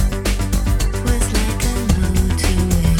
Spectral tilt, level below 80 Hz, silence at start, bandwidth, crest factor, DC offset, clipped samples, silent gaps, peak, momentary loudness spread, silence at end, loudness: -5 dB/octave; -18 dBFS; 0 s; 18 kHz; 14 dB; under 0.1%; under 0.1%; none; -2 dBFS; 3 LU; 0 s; -19 LUFS